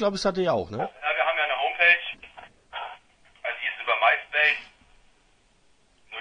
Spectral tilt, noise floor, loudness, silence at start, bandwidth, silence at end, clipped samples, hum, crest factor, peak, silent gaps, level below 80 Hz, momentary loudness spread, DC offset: -4 dB/octave; -62 dBFS; -23 LUFS; 0 s; 10 kHz; 0 s; under 0.1%; none; 22 dB; -6 dBFS; none; -60 dBFS; 18 LU; under 0.1%